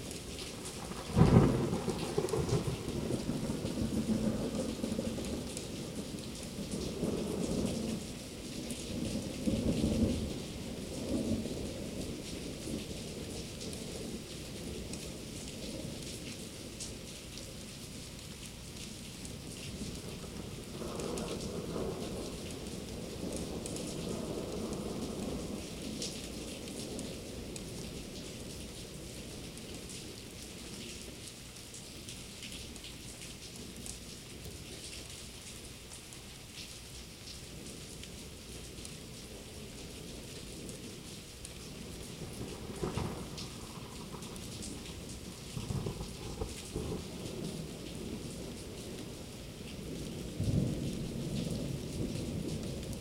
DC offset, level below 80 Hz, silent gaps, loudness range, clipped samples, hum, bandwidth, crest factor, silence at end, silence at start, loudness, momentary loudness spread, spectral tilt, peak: under 0.1%; -50 dBFS; none; 10 LU; under 0.1%; none; 16.5 kHz; 30 dB; 0 s; 0 s; -39 LUFS; 11 LU; -5 dB/octave; -10 dBFS